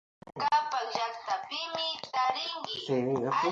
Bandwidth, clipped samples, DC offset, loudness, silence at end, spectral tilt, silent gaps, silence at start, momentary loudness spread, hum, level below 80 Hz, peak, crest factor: 7.8 kHz; under 0.1%; under 0.1%; -31 LUFS; 0 s; -4 dB/octave; none; 0.25 s; 6 LU; none; -74 dBFS; -14 dBFS; 18 dB